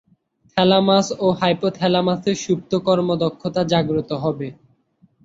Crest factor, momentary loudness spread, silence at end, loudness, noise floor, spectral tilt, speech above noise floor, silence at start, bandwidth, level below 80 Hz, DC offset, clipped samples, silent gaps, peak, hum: 18 dB; 8 LU; 0.7 s; -19 LUFS; -59 dBFS; -5.5 dB/octave; 40 dB; 0.55 s; 7.8 kHz; -56 dBFS; under 0.1%; under 0.1%; none; -2 dBFS; none